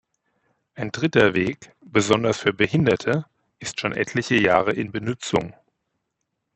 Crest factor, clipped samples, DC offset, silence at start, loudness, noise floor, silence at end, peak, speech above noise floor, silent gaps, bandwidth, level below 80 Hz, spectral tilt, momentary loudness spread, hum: 22 dB; under 0.1%; under 0.1%; 0.75 s; -22 LUFS; -78 dBFS; 1.05 s; 0 dBFS; 56 dB; none; 8.4 kHz; -56 dBFS; -5 dB/octave; 13 LU; none